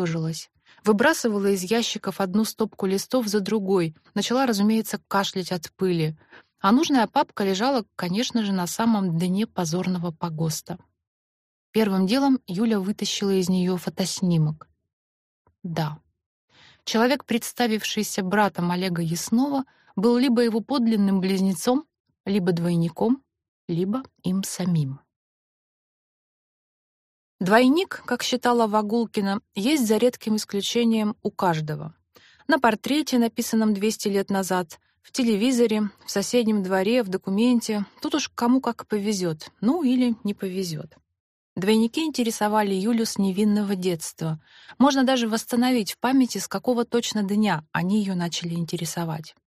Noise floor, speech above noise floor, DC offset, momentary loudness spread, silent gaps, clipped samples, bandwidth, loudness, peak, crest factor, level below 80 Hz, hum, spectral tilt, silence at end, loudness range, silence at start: -56 dBFS; 33 dB; under 0.1%; 8 LU; 11.07-11.73 s, 14.93-15.45 s, 16.26-16.48 s, 22.00-22.04 s, 22.20-22.24 s, 23.48-23.68 s, 25.16-27.39 s, 41.20-41.56 s; under 0.1%; 15.5 kHz; -24 LUFS; -4 dBFS; 20 dB; -68 dBFS; none; -5 dB/octave; 0.3 s; 4 LU; 0 s